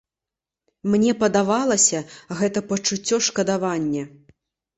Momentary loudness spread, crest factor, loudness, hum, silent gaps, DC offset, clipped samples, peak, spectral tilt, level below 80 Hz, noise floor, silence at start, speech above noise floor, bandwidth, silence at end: 12 LU; 18 dB; -21 LUFS; none; none; under 0.1%; under 0.1%; -4 dBFS; -3.5 dB/octave; -60 dBFS; -88 dBFS; 0.85 s; 67 dB; 8.2 kHz; 0.7 s